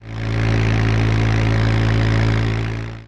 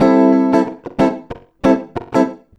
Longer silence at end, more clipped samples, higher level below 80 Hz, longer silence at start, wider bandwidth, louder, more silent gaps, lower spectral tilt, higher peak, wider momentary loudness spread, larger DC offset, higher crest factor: second, 0 s vs 0.2 s; neither; first, -26 dBFS vs -44 dBFS; about the same, 0 s vs 0 s; about the same, 7.6 kHz vs 8 kHz; about the same, -18 LUFS vs -16 LUFS; neither; about the same, -7 dB/octave vs -7.5 dB/octave; second, -6 dBFS vs 0 dBFS; second, 5 LU vs 11 LU; neither; about the same, 12 dB vs 14 dB